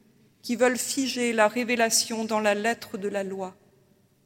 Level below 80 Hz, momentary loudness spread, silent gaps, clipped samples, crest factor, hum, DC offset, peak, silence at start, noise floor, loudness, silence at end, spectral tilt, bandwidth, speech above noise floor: -76 dBFS; 12 LU; none; under 0.1%; 20 dB; none; under 0.1%; -8 dBFS; 0.45 s; -62 dBFS; -25 LUFS; 0.75 s; -2.5 dB/octave; 16.5 kHz; 37 dB